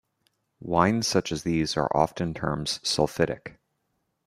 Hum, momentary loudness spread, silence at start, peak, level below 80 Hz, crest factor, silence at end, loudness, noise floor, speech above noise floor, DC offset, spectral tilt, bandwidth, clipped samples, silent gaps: none; 7 LU; 0.6 s; -4 dBFS; -52 dBFS; 22 dB; 0.75 s; -26 LUFS; -76 dBFS; 51 dB; under 0.1%; -4.5 dB/octave; 15.5 kHz; under 0.1%; none